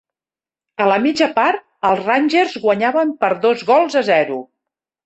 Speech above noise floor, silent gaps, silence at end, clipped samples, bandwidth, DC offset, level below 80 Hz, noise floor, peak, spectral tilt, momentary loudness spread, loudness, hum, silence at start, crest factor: over 75 dB; none; 0.65 s; under 0.1%; 8.4 kHz; under 0.1%; -64 dBFS; under -90 dBFS; -2 dBFS; -5 dB/octave; 5 LU; -16 LUFS; none; 0.8 s; 14 dB